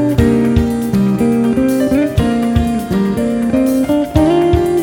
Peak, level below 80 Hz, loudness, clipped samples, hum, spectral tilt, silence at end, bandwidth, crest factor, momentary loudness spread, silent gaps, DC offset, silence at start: 0 dBFS; -26 dBFS; -14 LUFS; under 0.1%; none; -7.5 dB/octave; 0 s; 18.5 kHz; 12 dB; 4 LU; none; under 0.1%; 0 s